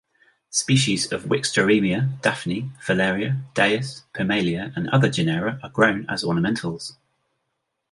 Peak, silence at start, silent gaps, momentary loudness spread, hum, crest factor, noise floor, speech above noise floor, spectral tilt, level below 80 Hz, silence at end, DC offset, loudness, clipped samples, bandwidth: -2 dBFS; 0.5 s; none; 9 LU; none; 20 dB; -77 dBFS; 55 dB; -4.5 dB/octave; -56 dBFS; 1 s; under 0.1%; -22 LUFS; under 0.1%; 11.5 kHz